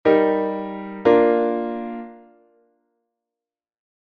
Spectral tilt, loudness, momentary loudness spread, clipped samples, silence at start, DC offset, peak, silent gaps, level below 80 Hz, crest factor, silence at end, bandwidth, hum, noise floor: -8.5 dB/octave; -20 LUFS; 16 LU; under 0.1%; 0.05 s; under 0.1%; -2 dBFS; none; -60 dBFS; 20 dB; 1.95 s; 5.2 kHz; none; -90 dBFS